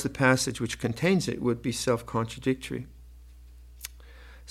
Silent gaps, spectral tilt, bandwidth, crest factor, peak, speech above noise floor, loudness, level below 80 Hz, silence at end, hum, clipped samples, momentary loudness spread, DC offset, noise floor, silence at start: none; -5 dB/octave; 16.5 kHz; 24 dB; -6 dBFS; 21 dB; -28 LUFS; -50 dBFS; 0 s; none; under 0.1%; 19 LU; under 0.1%; -49 dBFS; 0 s